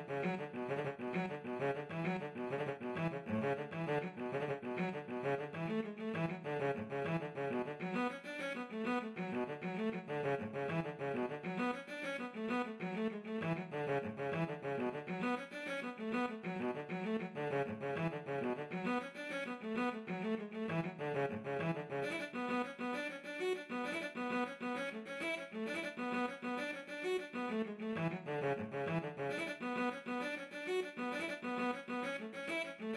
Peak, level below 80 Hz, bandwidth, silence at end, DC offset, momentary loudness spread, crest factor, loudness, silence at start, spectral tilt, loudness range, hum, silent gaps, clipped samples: -26 dBFS; -80 dBFS; 13 kHz; 0 s; under 0.1%; 3 LU; 14 dB; -40 LUFS; 0 s; -6.5 dB/octave; 1 LU; none; none; under 0.1%